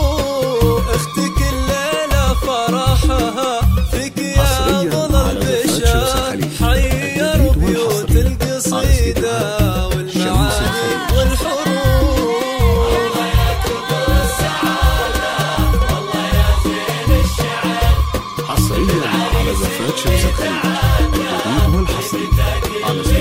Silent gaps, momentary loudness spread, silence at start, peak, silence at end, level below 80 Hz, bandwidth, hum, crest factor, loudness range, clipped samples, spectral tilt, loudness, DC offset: none; 4 LU; 0 s; 0 dBFS; 0 s; -18 dBFS; 16.5 kHz; none; 14 dB; 1 LU; under 0.1%; -5 dB/octave; -16 LUFS; under 0.1%